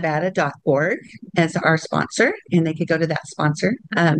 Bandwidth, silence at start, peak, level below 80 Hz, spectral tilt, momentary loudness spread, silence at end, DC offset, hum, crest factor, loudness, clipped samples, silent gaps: 9.8 kHz; 0 s; -4 dBFS; -60 dBFS; -6 dB/octave; 5 LU; 0 s; under 0.1%; none; 16 dB; -20 LUFS; under 0.1%; none